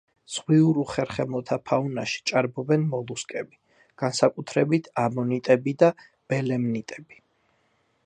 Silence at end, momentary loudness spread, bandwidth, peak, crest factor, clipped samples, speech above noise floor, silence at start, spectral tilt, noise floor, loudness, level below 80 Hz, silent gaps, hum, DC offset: 1.05 s; 13 LU; 10.5 kHz; -4 dBFS; 22 dB; under 0.1%; 44 dB; 0.3 s; -6 dB/octave; -68 dBFS; -25 LUFS; -64 dBFS; none; none; under 0.1%